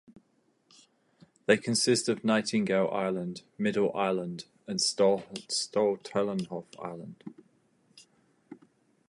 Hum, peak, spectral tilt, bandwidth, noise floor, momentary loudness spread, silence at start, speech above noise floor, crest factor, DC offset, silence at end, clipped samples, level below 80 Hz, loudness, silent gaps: none; -10 dBFS; -4 dB/octave; 11.5 kHz; -70 dBFS; 16 LU; 0.1 s; 41 dB; 22 dB; under 0.1%; 0.55 s; under 0.1%; -74 dBFS; -29 LUFS; none